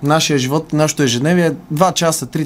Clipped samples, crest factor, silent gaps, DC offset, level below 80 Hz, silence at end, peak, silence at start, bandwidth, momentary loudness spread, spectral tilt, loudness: under 0.1%; 16 dB; none; under 0.1%; -50 dBFS; 0 s; 0 dBFS; 0 s; 16 kHz; 3 LU; -4.5 dB/octave; -15 LUFS